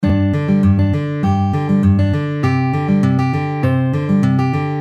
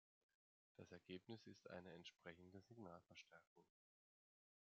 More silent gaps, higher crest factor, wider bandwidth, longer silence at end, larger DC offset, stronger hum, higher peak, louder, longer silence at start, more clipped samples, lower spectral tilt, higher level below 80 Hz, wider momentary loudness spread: second, none vs 3.47-3.56 s; second, 12 dB vs 22 dB; first, 8.2 kHz vs 7.2 kHz; second, 0 s vs 1 s; neither; neither; first, -2 dBFS vs -42 dBFS; first, -16 LUFS vs -62 LUFS; second, 0 s vs 0.8 s; neither; first, -9 dB/octave vs -4 dB/octave; first, -38 dBFS vs under -90 dBFS; second, 4 LU vs 7 LU